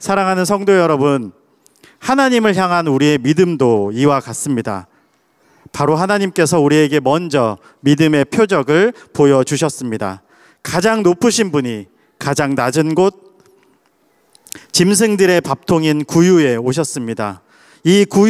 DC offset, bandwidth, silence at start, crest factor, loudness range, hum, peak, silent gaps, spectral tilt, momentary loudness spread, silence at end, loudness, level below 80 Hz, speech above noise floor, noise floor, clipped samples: under 0.1%; 15.5 kHz; 0 s; 14 dB; 3 LU; none; -2 dBFS; none; -5 dB/octave; 11 LU; 0 s; -14 LUFS; -56 dBFS; 44 dB; -58 dBFS; under 0.1%